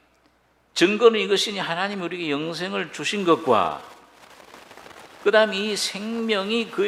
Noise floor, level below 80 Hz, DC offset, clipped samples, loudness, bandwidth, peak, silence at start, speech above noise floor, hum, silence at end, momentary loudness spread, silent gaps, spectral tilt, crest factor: -62 dBFS; -70 dBFS; under 0.1%; under 0.1%; -22 LUFS; 14.5 kHz; -2 dBFS; 0.75 s; 40 dB; none; 0 s; 10 LU; none; -3.5 dB/octave; 22 dB